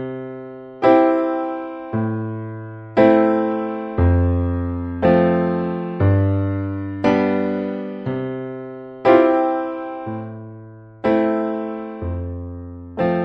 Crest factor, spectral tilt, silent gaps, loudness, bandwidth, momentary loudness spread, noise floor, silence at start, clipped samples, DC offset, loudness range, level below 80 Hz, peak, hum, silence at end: 18 dB; -10 dB/octave; none; -19 LUFS; 6 kHz; 18 LU; -39 dBFS; 0 s; under 0.1%; under 0.1%; 4 LU; -38 dBFS; 0 dBFS; none; 0 s